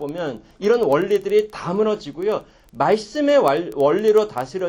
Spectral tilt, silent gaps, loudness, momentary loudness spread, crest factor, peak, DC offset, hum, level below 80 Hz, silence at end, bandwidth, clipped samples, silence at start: -6 dB/octave; none; -20 LUFS; 9 LU; 16 dB; -4 dBFS; under 0.1%; none; -56 dBFS; 0 s; 17 kHz; under 0.1%; 0 s